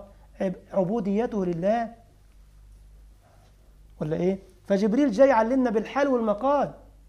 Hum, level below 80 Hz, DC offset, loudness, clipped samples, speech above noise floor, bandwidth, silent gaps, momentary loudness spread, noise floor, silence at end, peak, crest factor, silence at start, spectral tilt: 50 Hz at -50 dBFS; -52 dBFS; under 0.1%; -25 LUFS; under 0.1%; 31 dB; 10.5 kHz; none; 12 LU; -55 dBFS; 0.3 s; -8 dBFS; 18 dB; 0 s; -7.5 dB/octave